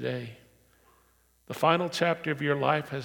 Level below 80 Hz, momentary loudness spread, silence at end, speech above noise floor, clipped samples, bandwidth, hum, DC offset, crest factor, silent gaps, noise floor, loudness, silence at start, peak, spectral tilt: -70 dBFS; 14 LU; 0 s; 37 dB; under 0.1%; 18 kHz; none; under 0.1%; 22 dB; none; -65 dBFS; -27 LUFS; 0 s; -8 dBFS; -5.5 dB/octave